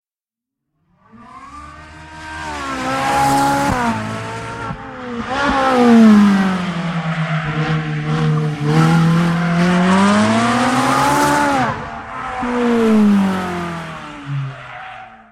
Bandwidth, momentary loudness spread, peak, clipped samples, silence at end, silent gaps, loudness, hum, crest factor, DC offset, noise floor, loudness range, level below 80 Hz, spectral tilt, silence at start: 15.5 kHz; 18 LU; -2 dBFS; under 0.1%; 0.15 s; none; -15 LUFS; none; 16 dB; under 0.1%; -88 dBFS; 5 LU; -42 dBFS; -6 dB/octave; 1.15 s